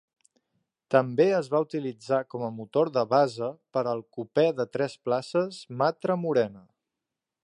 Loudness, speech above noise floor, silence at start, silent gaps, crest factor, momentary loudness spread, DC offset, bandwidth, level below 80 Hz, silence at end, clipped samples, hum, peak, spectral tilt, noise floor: -27 LUFS; 61 dB; 0.9 s; none; 20 dB; 10 LU; under 0.1%; 11 kHz; -76 dBFS; 0.85 s; under 0.1%; none; -6 dBFS; -6.5 dB/octave; -87 dBFS